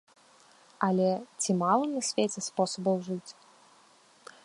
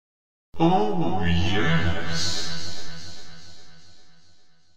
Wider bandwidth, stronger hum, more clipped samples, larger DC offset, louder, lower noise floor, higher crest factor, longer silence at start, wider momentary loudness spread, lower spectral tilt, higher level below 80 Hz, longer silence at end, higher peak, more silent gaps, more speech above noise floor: second, 11.5 kHz vs 15.5 kHz; neither; neither; second, under 0.1% vs 7%; second, -29 LUFS vs -24 LUFS; about the same, -60 dBFS vs -57 dBFS; about the same, 20 dB vs 18 dB; first, 0.8 s vs 0.5 s; second, 8 LU vs 21 LU; about the same, -4.5 dB/octave vs -5 dB/octave; second, -78 dBFS vs -48 dBFS; first, 1.15 s vs 0 s; about the same, -10 dBFS vs -8 dBFS; neither; about the same, 32 dB vs 35 dB